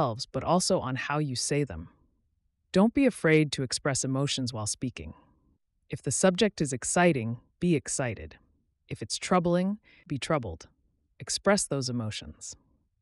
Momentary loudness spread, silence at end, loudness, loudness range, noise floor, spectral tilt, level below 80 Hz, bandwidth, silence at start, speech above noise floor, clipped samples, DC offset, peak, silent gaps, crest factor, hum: 18 LU; 0.5 s; -28 LUFS; 4 LU; -74 dBFS; -4.5 dB/octave; -56 dBFS; 12 kHz; 0 s; 46 dB; under 0.1%; under 0.1%; -12 dBFS; none; 18 dB; none